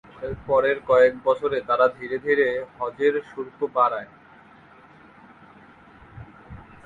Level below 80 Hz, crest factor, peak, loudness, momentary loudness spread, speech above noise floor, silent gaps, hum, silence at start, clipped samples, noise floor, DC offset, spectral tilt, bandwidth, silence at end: -54 dBFS; 18 dB; -6 dBFS; -22 LUFS; 16 LU; 28 dB; none; none; 0.15 s; under 0.1%; -50 dBFS; under 0.1%; -6.5 dB/octave; 7.4 kHz; 0.25 s